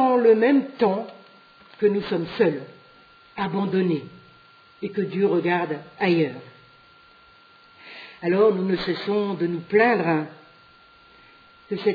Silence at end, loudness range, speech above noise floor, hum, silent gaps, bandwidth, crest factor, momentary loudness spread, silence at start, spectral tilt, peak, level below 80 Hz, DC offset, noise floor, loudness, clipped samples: 0 s; 3 LU; 31 dB; none; none; 5 kHz; 18 dB; 18 LU; 0 s; -9 dB/octave; -6 dBFS; -64 dBFS; under 0.1%; -53 dBFS; -23 LUFS; under 0.1%